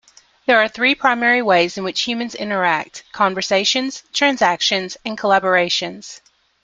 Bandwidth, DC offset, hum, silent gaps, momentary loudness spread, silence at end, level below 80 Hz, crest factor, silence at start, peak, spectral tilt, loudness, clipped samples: 9.4 kHz; under 0.1%; none; none; 9 LU; 0.45 s; -62 dBFS; 18 dB; 0.5 s; -2 dBFS; -2.5 dB/octave; -17 LUFS; under 0.1%